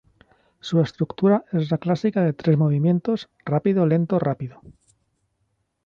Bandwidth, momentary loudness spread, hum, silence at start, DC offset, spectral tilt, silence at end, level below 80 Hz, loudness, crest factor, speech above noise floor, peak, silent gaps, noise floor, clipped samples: 7.2 kHz; 7 LU; none; 0.65 s; under 0.1%; -9 dB/octave; 1.35 s; -60 dBFS; -22 LUFS; 16 dB; 51 dB; -6 dBFS; none; -72 dBFS; under 0.1%